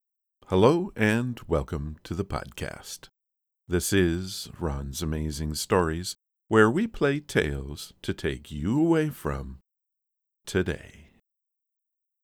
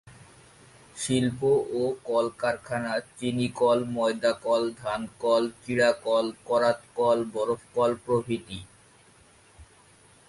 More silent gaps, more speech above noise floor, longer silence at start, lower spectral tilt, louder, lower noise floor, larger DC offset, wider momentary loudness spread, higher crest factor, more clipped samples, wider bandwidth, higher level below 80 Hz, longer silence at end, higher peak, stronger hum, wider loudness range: neither; first, 58 dB vs 31 dB; first, 0.5 s vs 0.05 s; about the same, -5.5 dB/octave vs -5 dB/octave; about the same, -27 LUFS vs -27 LUFS; first, -84 dBFS vs -57 dBFS; neither; first, 15 LU vs 8 LU; first, 24 dB vs 16 dB; neither; first, 18.5 kHz vs 11.5 kHz; first, -42 dBFS vs -60 dBFS; first, 1.2 s vs 0.65 s; first, -4 dBFS vs -10 dBFS; neither; about the same, 4 LU vs 3 LU